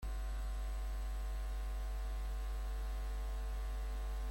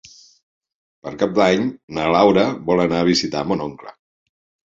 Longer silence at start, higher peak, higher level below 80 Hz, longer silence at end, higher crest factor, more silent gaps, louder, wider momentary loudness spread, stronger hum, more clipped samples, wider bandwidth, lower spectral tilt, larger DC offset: second, 0 s vs 1.05 s; second, -34 dBFS vs -2 dBFS; first, -40 dBFS vs -52 dBFS; second, 0 s vs 0.8 s; second, 6 dB vs 18 dB; second, none vs 1.83-1.88 s; second, -44 LUFS vs -18 LUFS; second, 0 LU vs 11 LU; neither; neither; first, 16.5 kHz vs 7.8 kHz; about the same, -5 dB/octave vs -5.5 dB/octave; neither